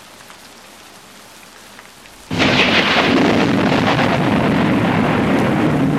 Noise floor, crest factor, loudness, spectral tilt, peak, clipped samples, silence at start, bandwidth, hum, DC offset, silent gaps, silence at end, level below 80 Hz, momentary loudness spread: -40 dBFS; 14 dB; -14 LUFS; -5.5 dB/octave; -2 dBFS; under 0.1%; 2.3 s; 15 kHz; none; 0.1%; none; 0 s; -42 dBFS; 4 LU